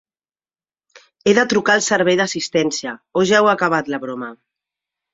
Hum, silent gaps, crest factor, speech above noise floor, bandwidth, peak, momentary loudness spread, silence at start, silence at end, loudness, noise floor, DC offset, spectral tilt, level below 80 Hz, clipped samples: none; none; 18 dB; over 73 dB; 8 kHz; -2 dBFS; 12 LU; 1.25 s; 0.8 s; -17 LUFS; under -90 dBFS; under 0.1%; -3.5 dB/octave; -60 dBFS; under 0.1%